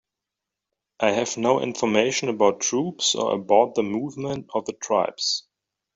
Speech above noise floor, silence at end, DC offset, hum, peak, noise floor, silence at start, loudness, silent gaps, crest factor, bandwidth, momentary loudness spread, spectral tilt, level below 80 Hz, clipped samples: 63 dB; 0.55 s; under 0.1%; none; -4 dBFS; -86 dBFS; 1 s; -23 LUFS; none; 20 dB; 8.2 kHz; 9 LU; -3 dB/octave; -66 dBFS; under 0.1%